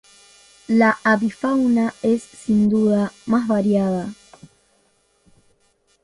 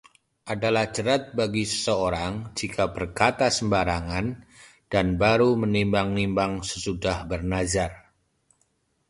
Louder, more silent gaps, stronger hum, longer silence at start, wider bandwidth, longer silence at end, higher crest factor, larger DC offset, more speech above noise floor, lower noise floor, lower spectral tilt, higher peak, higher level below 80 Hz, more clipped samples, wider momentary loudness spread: first, -19 LUFS vs -25 LUFS; neither; neither; first, 0.7 s vs 0.45 s; about the same, 11.5 kHz vs 11.5 kHz; first, 1.9 s vs 1.1 s; second, 16 dB vs 22 dB; neither; about the same, 44 dB vs 46 dB; second, -63 dBFS vs -70 dBFS; first, -7 dB/octave vs -4.5 dB/octave; about the same, -4 dBFS vs -4 dBFS; second, -56 dBFS vs -44 dBFS; neither; second, 6 LU vs 9 LU